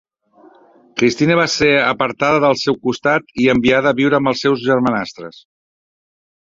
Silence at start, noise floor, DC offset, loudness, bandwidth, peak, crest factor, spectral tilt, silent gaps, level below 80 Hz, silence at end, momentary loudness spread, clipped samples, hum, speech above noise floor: 0.95 s; -49 dBFS; under 0.1%; -15 LUFS; 7.8 kHz; 0 dBFS; 16 dB; -5 dB/octave; none; -50 dBFS; 1.15 s; 7 LU; under 0.1%; none; 34 dB